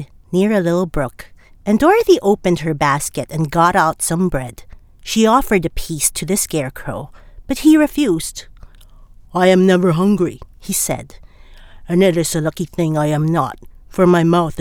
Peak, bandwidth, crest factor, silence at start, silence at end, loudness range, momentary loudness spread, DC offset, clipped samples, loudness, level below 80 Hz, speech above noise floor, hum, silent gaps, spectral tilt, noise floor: -2 dBFS; 19.5 kHz; 16 dB; 0 s; 0 s; 3 LU; 13 LU; under 0.1%; under 0.1%; -16 LUFS; -36 dBFS; 26 dB; none; none; -5 dB/octave; -42 dBFS